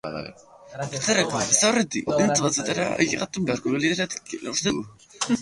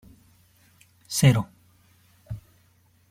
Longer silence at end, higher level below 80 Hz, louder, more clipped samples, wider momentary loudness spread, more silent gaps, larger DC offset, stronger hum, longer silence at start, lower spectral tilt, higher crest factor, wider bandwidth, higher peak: second, 0 s vs 0.7 s; about the same, -58 dBFS vs -56 dBFS; about the same, -23 LUFS vs -22 LUFS; neither; second, 15 LU vs 21 LU; neither; neither; neither; second, 0.05 s vs 1.1 s; second, -3 dB/octave vs -5 dB/octave; about the same, 22 dB vs 22 dB; second, 11.5 kHz vs 16 kHz; first, -2 dBFS vs -6 dBFS